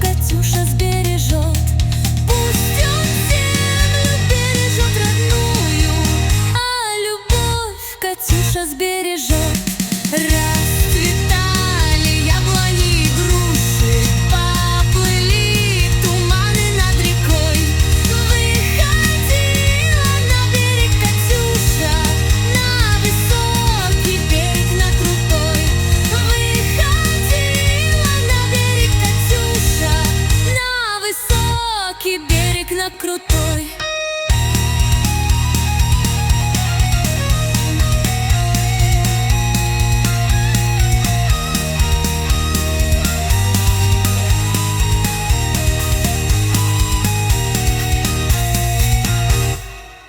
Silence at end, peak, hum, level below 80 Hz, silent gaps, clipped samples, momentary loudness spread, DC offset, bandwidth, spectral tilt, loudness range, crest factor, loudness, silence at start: 0.1 s; 0 dBFS; none; -20 dBFS; none; under 0.1%; 3 LU; under 0.1%; 19.5 kHz; -4 dB/octave; 3 LU; 14 dB; -15 LUFS; 0 s